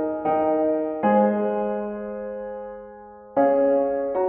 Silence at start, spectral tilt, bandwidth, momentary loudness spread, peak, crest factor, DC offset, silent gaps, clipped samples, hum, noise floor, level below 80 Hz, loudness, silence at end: 0 s; -7.5 dB/octave; 3.4 kHz; 17 LU; -8 dBFS; 14 dB; under 0.1%; none; under 0.1%; none; -43 dBFS; -58 dBFS; -23 LUFS; 0 s